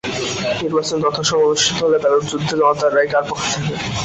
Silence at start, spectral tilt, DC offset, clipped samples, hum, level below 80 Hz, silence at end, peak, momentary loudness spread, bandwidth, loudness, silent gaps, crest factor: 0.05 s; -3.5 dB/octave; under 0.1%; under 0.1%; none; -48 dBFS; 0 s; -4 dBFS; 6 LU; 8.2 kHz; -17 LUFS; none; 14 dB